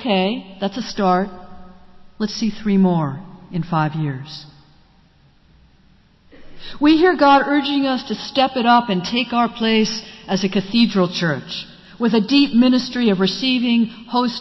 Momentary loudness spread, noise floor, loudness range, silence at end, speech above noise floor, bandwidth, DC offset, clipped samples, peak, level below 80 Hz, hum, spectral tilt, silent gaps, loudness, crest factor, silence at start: 14 LU; -53 dBFS; 8 LU; 0 s; 35 dB; 6.2 kHz; under 0.1%; under 0.1%; -4 dBFS; -48 dBFS; none; -6 dB/octave; none; -18 LUFS; 14 dB; 0 s